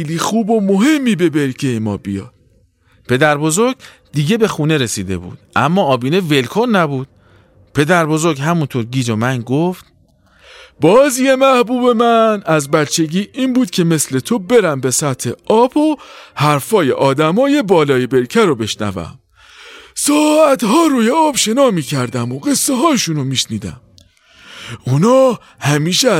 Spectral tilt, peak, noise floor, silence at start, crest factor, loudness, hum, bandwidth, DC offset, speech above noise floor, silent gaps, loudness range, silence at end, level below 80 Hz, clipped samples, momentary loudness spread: -5 dB/octave; 0 dBFS; -53 dBFS; 0 s; 14 dB; -14 LUFS; none; 16.5 kHz; under 0.1%; 40 dB; none; 4 LU; 0 s; -52 dBFS; under 0.1%; 10 LU